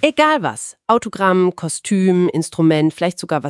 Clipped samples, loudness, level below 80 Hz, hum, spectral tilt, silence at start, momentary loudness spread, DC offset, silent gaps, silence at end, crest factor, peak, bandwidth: under 0.1%; -17 LUFS; -62 dBFS; none; -5.5 dB/octave; 0 s; 7 LU; under 0.1%; none; 0 s; 16 dB; 0 dBFS; 12 kHz